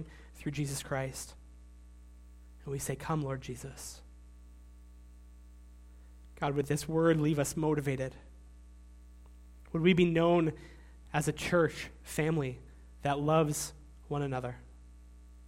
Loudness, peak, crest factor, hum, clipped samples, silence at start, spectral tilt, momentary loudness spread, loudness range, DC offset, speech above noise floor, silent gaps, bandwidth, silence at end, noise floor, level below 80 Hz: -32 LUFS; -14 dBFS; 20 dB; 60 Hz at -55 dBFS; under 0.1%; 0 s; -5.5 dB/octave; 17 LU; 10 LU; under 0.1%; 22 dB; none; 16.5 kHz; 0 s; -53 dBFS; -52 dBFS